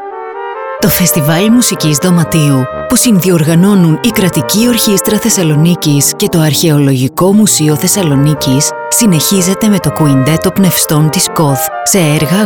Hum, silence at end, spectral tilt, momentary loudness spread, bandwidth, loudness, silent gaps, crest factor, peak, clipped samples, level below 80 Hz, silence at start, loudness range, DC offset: none; 0 s; -4.5 dB/octave; 3 LU; over 20 kHz; -9 LUFS; none; 8 dB; 0 dBFS; under 0.1%; -40 dBFS; 0 s; 1 LU; under 0.1%